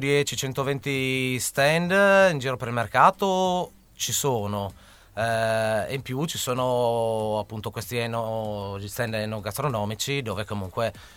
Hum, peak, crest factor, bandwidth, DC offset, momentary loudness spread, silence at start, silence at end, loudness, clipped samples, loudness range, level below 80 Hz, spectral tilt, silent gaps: none; -4 dBFS; 22 dB; 18 kHz; under 0.1%; 12 LU; 0 s; 0.05 s; -25 LUFS; under 0.1%; 7 LU; -54 dBFS; -4 dB/octave; none